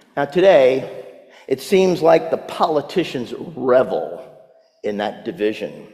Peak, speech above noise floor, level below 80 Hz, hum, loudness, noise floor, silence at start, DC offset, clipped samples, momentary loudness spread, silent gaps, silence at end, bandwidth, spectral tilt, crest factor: -2 dBFS; 32 dB; -62 dBFS; none; -18 LUFS; -49 dBFS; 0.15 s; under 0.1%; under 0.1%; 16 LU; none; 0.1 s; 14.5 kHz; -6 dB/octave; 18 dB